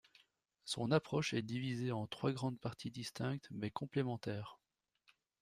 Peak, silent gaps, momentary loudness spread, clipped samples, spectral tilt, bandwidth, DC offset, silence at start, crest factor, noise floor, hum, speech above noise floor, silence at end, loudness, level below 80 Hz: -18 dBFS; none; 10 LU; under 0.1%; -6 dB/octave; 15 kHz; under 0.1%; 0.65 s; 22 dB; -75 dBFS; none; 36 dB; 0.85 s; -41 LUFS; -74 dBFS